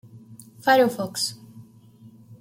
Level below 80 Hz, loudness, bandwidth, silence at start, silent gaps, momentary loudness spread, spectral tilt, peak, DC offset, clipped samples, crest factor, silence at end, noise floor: -72 dBFS; -22 LUFS; 16.5 kHz; 0.15 s; none; 10 LU; -3.5 dB/octave; -6 dBFS; under 0.1%; under 0.1%; 20 dB; 0.05 s; -50 dBFS